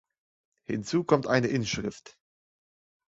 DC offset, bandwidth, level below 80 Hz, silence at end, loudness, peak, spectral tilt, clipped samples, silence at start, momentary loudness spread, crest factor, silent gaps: under 0.1%; 8 kHz; -60 dBFS; 1 s; -28 LUFS; -6 dBFS; -5.5 dB/octave; under 0.1%; 0.7 s; 12 LU; 24 dB; none